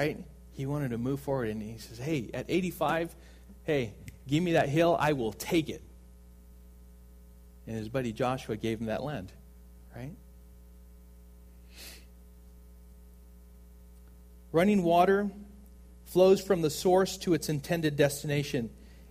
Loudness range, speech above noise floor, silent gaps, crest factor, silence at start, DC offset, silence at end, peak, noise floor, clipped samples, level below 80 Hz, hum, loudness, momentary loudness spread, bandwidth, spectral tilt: 13 LU; 24 dB; none; 20 dB; 0 s; under 0.1%; 0 s; -10 dBFS; -53 dBFS; under 0.1%; -52 dBFS; 60 Hz at -50 dBFS; -29 LUFS; 21 LU; 15.5 kHz; -6 dB/octave